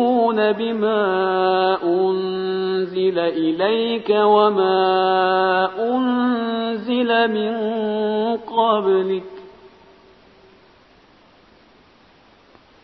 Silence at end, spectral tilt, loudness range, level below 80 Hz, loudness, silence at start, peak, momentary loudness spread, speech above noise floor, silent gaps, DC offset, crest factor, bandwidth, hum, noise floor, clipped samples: 3.15 s; -8.5 dB/octave; 6 LU; -64 dBFS; -19 LUFS; 0 s; -4 dBFS; 6 LU; 34 dB; none; under 0.1%; 16 dB; 5.2 kHz; none; -52 dBFS; under 0.1%